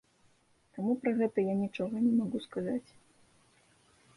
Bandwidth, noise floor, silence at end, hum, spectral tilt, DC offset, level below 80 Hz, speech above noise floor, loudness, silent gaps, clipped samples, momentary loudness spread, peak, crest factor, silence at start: 11 kHz; -68 dBFS; 1.35 s; none; -8 dB/octave; under 0.1%; -72 dBFS; 36 dB; -32 LUFS; none; under 0.1%; 8 LU; -18 dBFS; 16 dB; 0.75 s